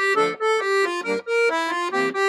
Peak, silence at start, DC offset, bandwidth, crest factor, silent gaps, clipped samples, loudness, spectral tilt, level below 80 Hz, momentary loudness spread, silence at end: -10 dBFS; 0 s; under 0.1%; 14 kHz; 12 dB; none; under 0.1%; -21 LUFS; -3 dB/octave; -82 dBFS; 3 LU; 0 s